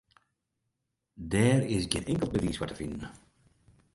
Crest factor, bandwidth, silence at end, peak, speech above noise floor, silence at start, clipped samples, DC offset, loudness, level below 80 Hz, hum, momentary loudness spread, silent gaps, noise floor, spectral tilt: 24 dB; 11.5 kHz; 0.8 s; -8 dBFS; 53 dB; 1.15 s; under 0.1%; under 0.1%; -30 LUFS; -50 dBFS; none; 16 LU; none; -83 dBFS; -5.5 dB/octave